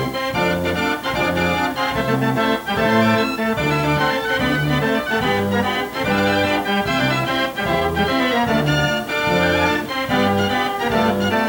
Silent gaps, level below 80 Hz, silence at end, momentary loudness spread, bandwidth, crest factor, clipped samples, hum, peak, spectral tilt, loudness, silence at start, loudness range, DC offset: none; -42 dBFS; 0 s; 3 LU; over 20 kHz; 14 dB; under 0.1%; none; -4 dBFS; -5.5 dB/octave; -18 LUFS; 0 s; 1 LU; under 0.1%